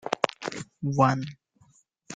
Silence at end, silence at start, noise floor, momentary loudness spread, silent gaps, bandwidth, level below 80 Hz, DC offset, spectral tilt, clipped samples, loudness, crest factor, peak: 0 s; 0.05 s; -63 dBFS; 13 LU; none; 9.2 kHz; -66 dBFS; under 0.1%; -6 dB/octave; under 0.1%; -27 LUFS; 28 dB; -2 dBFS